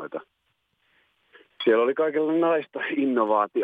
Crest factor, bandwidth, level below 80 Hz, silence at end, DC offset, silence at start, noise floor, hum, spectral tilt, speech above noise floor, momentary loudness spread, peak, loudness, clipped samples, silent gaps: 16 dB; 4.9 kHz; -84 dBFS; 0 s; under 0.1%; 0 s; -73 dBFS; none; -7.5 dB/octave; 51 dB; 7 LU; -8 dBFS; -23 LUFS; under 0.1%; none